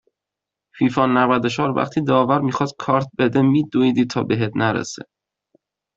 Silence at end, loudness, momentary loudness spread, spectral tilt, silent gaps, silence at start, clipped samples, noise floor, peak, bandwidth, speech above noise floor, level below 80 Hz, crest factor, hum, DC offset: 0.95 s; -19 LUFS; 5 LU; -6.5 dB/octave; none; 0.75 s; under 0.1%; -85 dBFS; -2 dBFS; 7.8 kHz; 67 dB; -58 dBFS; 18 dB; none; under 0.1%